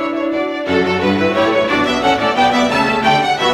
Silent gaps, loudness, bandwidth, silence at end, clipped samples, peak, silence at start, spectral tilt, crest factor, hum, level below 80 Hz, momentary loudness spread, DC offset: none; -14 LUFS; 15.5 kHz; 0 s; under 0.1%; -2 dBFS; 0 s; -4.5 dB/octave; 12 dB; none; -46 dBFS; 5 LU; under 0.1%